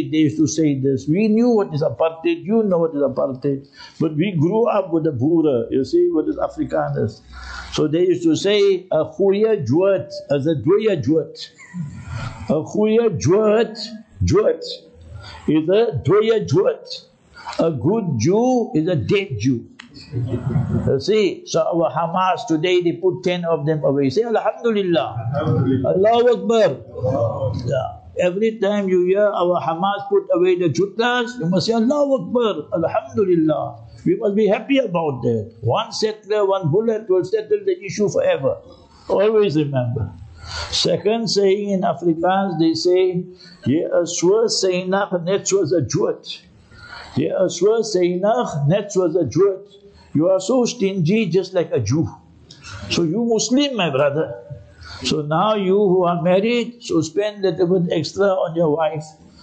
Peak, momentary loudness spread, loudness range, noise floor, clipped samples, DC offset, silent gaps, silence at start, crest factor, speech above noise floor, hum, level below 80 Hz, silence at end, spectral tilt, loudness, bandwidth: -8 dBFS; 10 LU; 2 LU; -42 dBFS; under 0.1%; under 0.1%; none; 0 s; 10 dB; 24 dB; none; -50 dBFS; 0.3 s; -6 dB/octave; -19 LUFS; 8.8 kHz